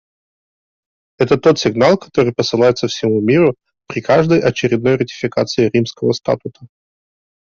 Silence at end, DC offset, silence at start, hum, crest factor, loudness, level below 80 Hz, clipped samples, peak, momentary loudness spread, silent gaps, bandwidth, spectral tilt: 0.85 s; under 0.1%; 1.2 s; none; 14 dB; -15 LUFS; -52 dBFS; under 0.1%; -2 dBFS; 8 LU; none; 7.4 kHz; -6 dB/octave